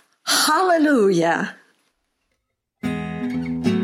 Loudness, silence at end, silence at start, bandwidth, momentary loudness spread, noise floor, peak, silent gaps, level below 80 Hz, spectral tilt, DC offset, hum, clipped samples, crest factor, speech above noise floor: -19 LUFS; 0 s; 0.25 s; 16 kHz; 12 LU; -75 dBFS; -6 dBFS; none; -54 dBFS; -4 dB/octave; under 0.1%; none; under 0.1%; 16 dB; 57 dB